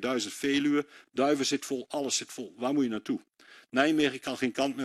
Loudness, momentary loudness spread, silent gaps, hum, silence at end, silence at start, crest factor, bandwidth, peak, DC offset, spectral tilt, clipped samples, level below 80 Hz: -29 LUFS; 8 LU; none; none; 0 s; 0 s; 20 dB; 13 kHz; -10 dBFS; under 0.1%; -3 dB/octave; under 0.1%; -72 dBFS